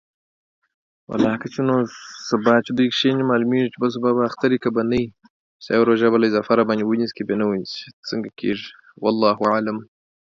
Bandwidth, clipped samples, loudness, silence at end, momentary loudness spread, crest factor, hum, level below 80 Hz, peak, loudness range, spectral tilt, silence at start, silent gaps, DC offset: 7.4 kHz; under 0.1%; -20 LUFS; 0.5 s; 11 LU; 18 dB; none; -58 dBFS; -2 dBFS; 3 LU; -6 dB/octave; 1.1 s; 5.30-5.60 s, 7.93-8.03 s; under 0.1%